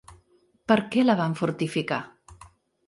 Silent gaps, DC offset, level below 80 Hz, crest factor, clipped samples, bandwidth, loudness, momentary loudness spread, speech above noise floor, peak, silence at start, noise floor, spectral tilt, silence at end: none; under 0.1%; -62 dBFS; 20 dB; under 0.1%; 11.5 kHz; -25 LUFS; 13 LU; 39 dB; -6 dBFS; 0.1 s; -63 dBFS; -6.5 dB/octave; 0.4 s